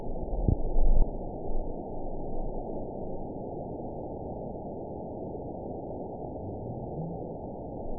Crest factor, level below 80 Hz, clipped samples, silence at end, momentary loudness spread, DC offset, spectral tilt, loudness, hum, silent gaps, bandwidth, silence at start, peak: 20 dB; -32 dBFS; under 0.1%; 0 s; 8 LU; 0.3%; -16 dB/octave; -36 LUFS; none; none; 1 kHz; 0 s; -10 dBFS